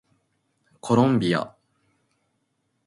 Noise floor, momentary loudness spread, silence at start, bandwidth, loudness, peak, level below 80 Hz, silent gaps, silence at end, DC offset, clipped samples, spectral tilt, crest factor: -73 dBFS; 19 LU; 0.85 s; 11.5 kHz; -22 LUFS; -6 dBFS; -64 dBFS; none; 1.4 s; under 0.1%; under 0.1%; -7 dB/octave; 20 dB